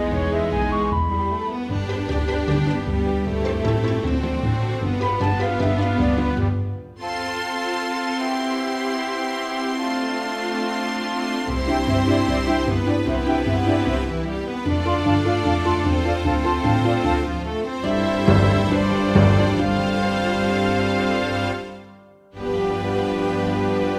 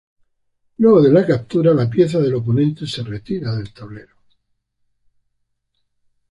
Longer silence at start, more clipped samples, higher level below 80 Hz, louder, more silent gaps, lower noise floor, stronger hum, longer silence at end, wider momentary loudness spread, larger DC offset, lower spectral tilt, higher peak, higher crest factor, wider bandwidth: second, 0 s vs 0.8 s; neither; first, -32 dBFS vs -52 dBFS; second, -22 LUFS vs -16 LUFS; neither; second, -47 dBFS vs -70 dBFS; second, none vs 50 Hz at -45 dBFS; second, 0 s vs 2.3 s; second, 7 LU vs 15 LU; neither; second, -6.5 dB/octave vs -8.5 dB/octave; about the same, -2 dBFS vs -2 dBFS; about the same, 18 dB vs 16 dB; about the same, 12.5 kHz vs 11.5 kHz